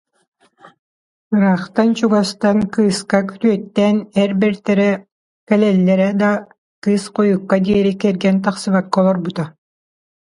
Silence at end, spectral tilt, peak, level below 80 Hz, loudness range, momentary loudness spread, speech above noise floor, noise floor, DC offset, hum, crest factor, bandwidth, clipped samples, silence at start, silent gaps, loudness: 0.75 s; -6.5 dB/octave; 0 dBFS; -54 dBFS; 1 LU; 5 LU; over 75 dB; under -90 dBFS; under 0.1%; none; 16 dB; 11.5 kHz; under 0.1%; 1.3 s; 5.12-5.47 s, 6.58-6.82 s; -16 LUFS